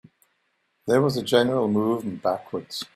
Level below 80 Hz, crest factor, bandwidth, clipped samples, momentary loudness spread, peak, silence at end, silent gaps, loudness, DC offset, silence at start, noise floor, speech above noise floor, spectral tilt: -64 dBFS; 20 dB; 15.5 kHz; under 0.1%; 11 LU; -4 dBFS; 0.1 s; none; -24 LUFS; under 0.1%; 0.85 s; -72 dBFS; 49 dB; -6 dB/octave